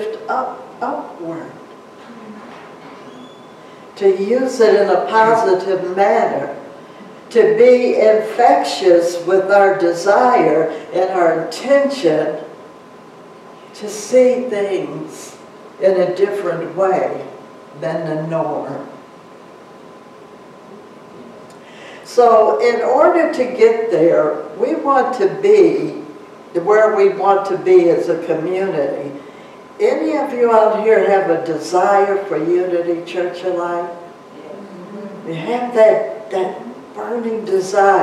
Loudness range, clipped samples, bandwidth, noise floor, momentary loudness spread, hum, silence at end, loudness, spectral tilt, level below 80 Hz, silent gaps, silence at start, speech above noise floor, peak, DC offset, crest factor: 9 LU; under 0.1%; 13 kHz; -39 dBFS; 20 LU; none; 0 s; -15 LUFS; -5.5 dB/octave; -68 dBFS; none; 0 s; 25 dB; 0 dBFS; under 0.1%; 14 dB